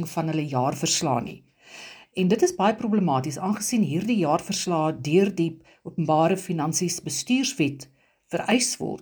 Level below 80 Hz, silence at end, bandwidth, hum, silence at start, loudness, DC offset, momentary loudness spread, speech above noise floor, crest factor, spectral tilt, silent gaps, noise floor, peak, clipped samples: -64 dBFS; 0 s; over 20 kHz; none; 0 s; -24 LUFS; under 0.1%; 10 LU; 21 dB; 16 dB; -4.5 dB/octave; none; -45 dBFS; -8 dBFS; under 0.1%